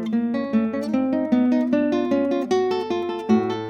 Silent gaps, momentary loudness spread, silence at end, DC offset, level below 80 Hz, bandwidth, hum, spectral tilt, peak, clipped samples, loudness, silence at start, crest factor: none; 4 LU; 0 s; under 0.1%; -66 dBFS; 8.6 kHz; none; -7 dB/octave; -6 dBFS; under 0.1%; -22 LUFS; 0 s; 14 dB